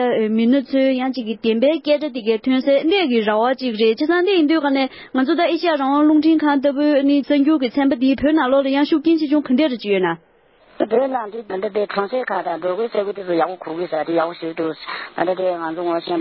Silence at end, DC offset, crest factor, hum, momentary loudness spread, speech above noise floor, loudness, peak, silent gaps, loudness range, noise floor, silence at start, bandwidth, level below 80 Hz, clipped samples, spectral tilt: 0 s; under 0.1%; 16 dB; none; 8 LU; 34 dB; -18 LUFS; -2 dBFS; none; 6 LU; -52 dBFS; 0 s; 5.8 kHz; -56 dBFS; under 0.1%; -10 dB/octave